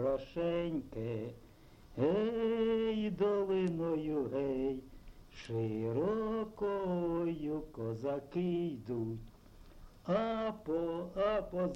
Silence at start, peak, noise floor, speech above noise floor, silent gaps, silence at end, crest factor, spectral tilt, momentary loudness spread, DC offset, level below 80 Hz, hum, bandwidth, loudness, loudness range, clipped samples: 0 s; -22 dBFS; -56 dBFS; 21 dB; none; 0 s; 14 dB; -8.5 dB/octave; 9 LU; under 0.1%; -58 dBFS; none; 15.5 kHz; -36 LUFS; 4 LU; under 0.1%